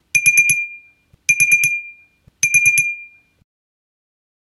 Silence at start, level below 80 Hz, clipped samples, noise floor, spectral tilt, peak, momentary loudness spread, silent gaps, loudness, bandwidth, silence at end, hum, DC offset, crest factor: 0.15 s; -62 dBFS; under 0.1%; -51 dBFS; 1 dB/octave; 0 dBFS; 13 LU; none; -13 LUFS; 16 kHz; 1.35 s; none; under 0.1%; 18 dB